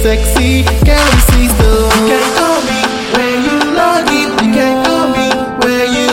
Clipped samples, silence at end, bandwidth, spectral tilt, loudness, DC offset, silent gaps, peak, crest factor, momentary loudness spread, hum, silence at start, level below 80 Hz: under 0.1%; 0 s; 17 kHz; -4.5 dB/octave; -10 LUFS; under 0.1%; none; 0 dBFS; 10 dB; 4 LU; none; 0 s; -16 dBFS